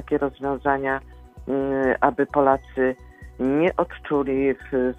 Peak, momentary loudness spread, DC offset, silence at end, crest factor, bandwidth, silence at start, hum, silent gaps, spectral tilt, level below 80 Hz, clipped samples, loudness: 0 dBFS; 7 LU; under 0.1%; 0 s; 22 dB; 6.2 kHz; 0 s; none; none; -8.5 dB/octave; -46 dBFS; under 0.1%; -23 LUFS